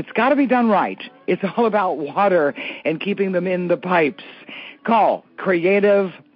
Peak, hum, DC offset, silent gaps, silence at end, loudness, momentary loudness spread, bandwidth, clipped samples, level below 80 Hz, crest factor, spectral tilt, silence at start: -4 dBFS; none; under 0.1%; none; 0.2 s; -19 LUFS; 10 LU; 5.6 kHz; under 0.1%; -70 dBFS; 14 dB; -4.5 dB/octave; 0 s